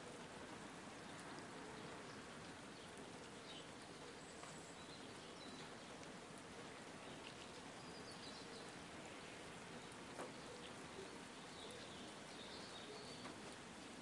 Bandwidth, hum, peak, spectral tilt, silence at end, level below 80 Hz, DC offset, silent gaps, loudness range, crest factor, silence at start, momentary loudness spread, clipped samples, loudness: 12 kHz; none; -36 dBFS; -3.5 dB/octave; 0 s; -78 dBFS; under 0.1%; none; 1 LU; 18 dB; 0 s; 2 LU; under 0.1%; -54 LUFS